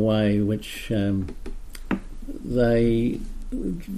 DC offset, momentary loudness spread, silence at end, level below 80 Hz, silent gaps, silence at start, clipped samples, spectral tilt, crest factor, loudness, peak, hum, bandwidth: under 0.1%; 18 LU; 0 s; -34 dBFS; none; 0 s; under 0.1%; -7.5 dB/octave; 14 dB; -25 LUFS; -10 dBFS; none; 14.5 kHz